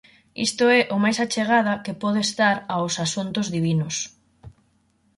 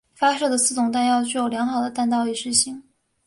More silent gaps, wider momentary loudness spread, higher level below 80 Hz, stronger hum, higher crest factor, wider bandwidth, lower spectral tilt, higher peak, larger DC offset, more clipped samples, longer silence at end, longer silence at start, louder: neither; first, 8 LU vs 4 LU; about the same, -60 dBFS vs -62 dBFS; neither; about the same, 16 dB vs 18 dB; about the same, 11.5 kHz vs 11.5 kHz; first, -4 dB/octave vs -2 dB/octave; second, -8 dBFS vs -4 dBFS; neither; neither; first, 0.7 s vs 0.45 s; first, 0.35 s vs 0.2 s; about the same, -22 LUFS vs -21 LUFS